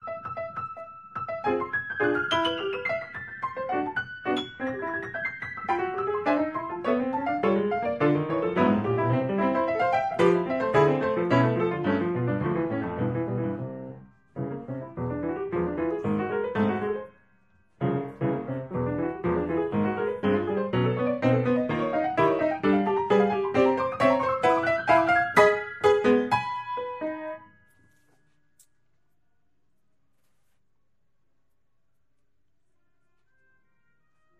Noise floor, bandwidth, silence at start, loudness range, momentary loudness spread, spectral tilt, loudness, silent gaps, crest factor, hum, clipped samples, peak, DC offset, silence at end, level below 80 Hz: -78 dBFS; 12 kHz; 0 s; 8 LU; 12 LU; -7 dB/octave; -26 LUFS; none; 22 dB; none; under 0.1%; -6 dBFS; under 0.1%; 6.95 s; -58 dBFS